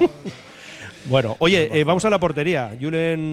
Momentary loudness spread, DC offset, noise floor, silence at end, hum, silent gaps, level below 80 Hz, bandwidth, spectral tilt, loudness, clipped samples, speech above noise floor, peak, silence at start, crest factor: 19 LU; under 0.1%; -39 dBFS; 0 s; none; none; -50 dBFS; 14 kHz; -5.5 dB/octave; -20 LUFS; under 0.1%; 19 dB; -4 dBFS; 0 s; 16 dB